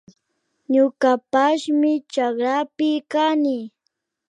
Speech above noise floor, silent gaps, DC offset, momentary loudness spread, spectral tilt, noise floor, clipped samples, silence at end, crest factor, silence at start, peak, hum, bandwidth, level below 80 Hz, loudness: 56 dB; none; under 0.1%; 5 LU; -4 dB/octave; -75 dBFS; under 0.1%; 0.6 s; 16 dB; 0.7 s; -4 dBFS; none; 9.8 kHz; -76 dBFS; -20 LUFS